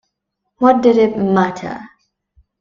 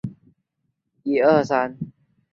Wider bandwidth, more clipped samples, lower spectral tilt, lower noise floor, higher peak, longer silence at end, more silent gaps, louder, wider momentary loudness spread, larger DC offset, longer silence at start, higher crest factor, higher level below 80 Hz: about the same, 7.4 kHz vs 7.6 kHz; neither; about the same, -7.5 dB/octave vs -7 dB/octave; about the same, -75 dBFS vs -75 dBFS; first, 0 dBFS vs -4 dBFS; first, 0.75 s vs 0.45 s; neither; first, -14 LUFS vs -20 LUFS; second, 16 LU vs 19 LU; neither; first, 0.6 s vs 0.05 s; about the same, 16 dB vs 20 dB; first, -54 dBFS vs -62 dBFS